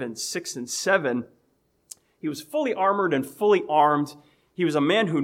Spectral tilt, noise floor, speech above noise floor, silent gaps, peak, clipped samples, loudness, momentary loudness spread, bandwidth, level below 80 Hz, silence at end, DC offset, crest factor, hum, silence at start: -4.5 dB/octave; -68 dBFS; 44 dB; none; -6 dBFS; under 0.1%; -24 LUFS; 13 LU; 16.5 kHz; -76 dBFS; 0 s; under 0.1%; 18 dB; none; 0 s